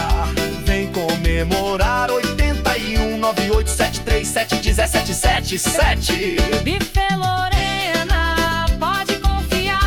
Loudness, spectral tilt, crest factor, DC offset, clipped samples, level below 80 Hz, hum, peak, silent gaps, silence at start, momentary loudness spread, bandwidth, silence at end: -18 LUFS; -4 dB/octave; 12 dB; under 0.1%; under 0.1%; -22 dBFS; none; -6 dBFS; none; 0 s; 3 LU; 18 kHz; 0 s